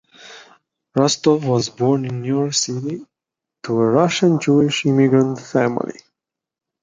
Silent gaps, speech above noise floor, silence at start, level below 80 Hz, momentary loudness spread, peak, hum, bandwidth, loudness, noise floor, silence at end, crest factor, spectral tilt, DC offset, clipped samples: none; 68 dB; 0.25 s; -60 dBFS; 11 LU; -2 dBFS; none; 9.6 kHz; -18 LUFS; -85 dBFS; 0.9 s; 16 dB; -5.5 dB/octave; under 0.1%; under 0.1%